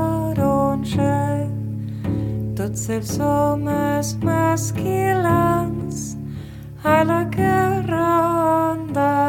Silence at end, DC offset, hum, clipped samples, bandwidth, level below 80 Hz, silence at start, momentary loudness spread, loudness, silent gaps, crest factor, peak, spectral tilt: 0 s; under 0.1%; none; under 0.1%; 17.5 kHz; -42 dBFS; 0 s; 9 LU; -20 LUFS; none; 18 dB; -2 dBFS; -6.5 dB/octave